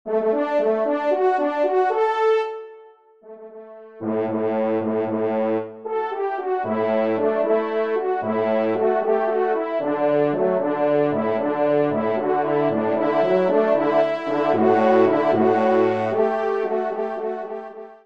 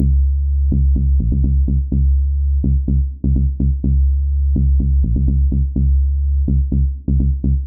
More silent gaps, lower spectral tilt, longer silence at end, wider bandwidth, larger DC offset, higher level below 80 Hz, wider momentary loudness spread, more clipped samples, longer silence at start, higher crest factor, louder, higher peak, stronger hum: neither; second, -8 dB/octave vs -21.5 dB/octave; about the same, 0.1 s vs 0 s; first, 7 kHz vs 0.7 kHz; about the same, 0.2% vs 0.3%; second, -70 dBFS vs -16 dBFS; first, 8 LU vs 2 LU; neither; about the same, 0.05 s vs 0 s; first, 16 dB vs 10 dB; second, -21 LUFS vs -17 LUFS; about the same, -6 dBFS vs -4 dBFS; neither